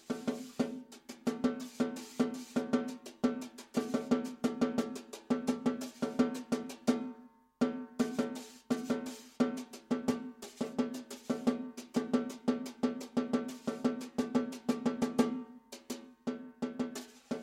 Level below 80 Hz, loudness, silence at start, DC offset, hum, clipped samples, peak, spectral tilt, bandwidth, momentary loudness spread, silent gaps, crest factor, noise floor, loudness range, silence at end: -72 dBFS; -36 LUFS; 0.1 s; under 0.1%; none; under 0.1%; -16 dBFS; -5.5 dB/octave; 15.5 kHz; 10 LU; none; 20 dB; -56 dBFS; 2 LU; 0 s